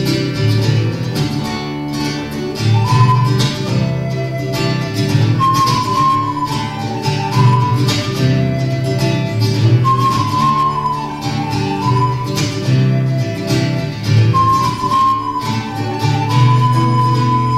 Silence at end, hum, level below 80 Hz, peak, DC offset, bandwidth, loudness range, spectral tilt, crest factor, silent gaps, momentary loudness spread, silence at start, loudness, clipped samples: 0 s; none; -40 dBFS; 0 dBFS; under 0.1%; 14.5 kHz; 2 LU; -6 dB/octave; 14 dB; none; 8 LU; 0 s; -15 LUFS; under 0.1%